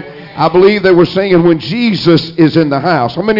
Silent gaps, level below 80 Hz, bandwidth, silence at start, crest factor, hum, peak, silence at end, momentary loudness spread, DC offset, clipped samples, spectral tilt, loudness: none; -44 dBFS; 5.8 kHz; 0 s; 10 dB; none; 0 dBFS; 0 s; 5 LU; under 0.1%; under 0.1%; -8 dB/octave; -10 LUFS